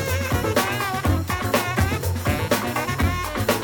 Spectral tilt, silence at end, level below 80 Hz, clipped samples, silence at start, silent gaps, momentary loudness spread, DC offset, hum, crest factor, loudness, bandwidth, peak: -5 dB/octave; 0 s; -36 dBFS; under 0.1%; 0 s; none; 2 LU; under 0.1%; none; 16 dB; -23 LUFS; 19.5 kHz; -6 dBFS